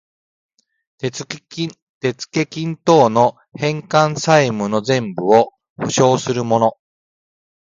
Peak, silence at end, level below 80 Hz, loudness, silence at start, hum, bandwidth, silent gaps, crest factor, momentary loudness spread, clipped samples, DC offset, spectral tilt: 0 dBFS; 0.95 s; -60 dBFS; -17 LUFS; 1.05 s; none; 9.4 kHz; 1.82-2.01 s, 5.70-5.76 s; 18 dB; 12 LU; under 0.1%; under 0.1%; -5 dB/octave